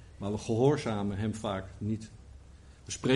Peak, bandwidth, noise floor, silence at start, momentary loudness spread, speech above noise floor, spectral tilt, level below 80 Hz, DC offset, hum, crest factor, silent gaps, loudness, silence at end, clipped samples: -12 dBFS; 11.5 kHz; -53 dBFS; 0 s; 19 LU; 22 dB; -6 dB/octave; -54 dBFS; under 0.1%; none; 20 dB; none; -32 LUFS; 0 s; under 0.1%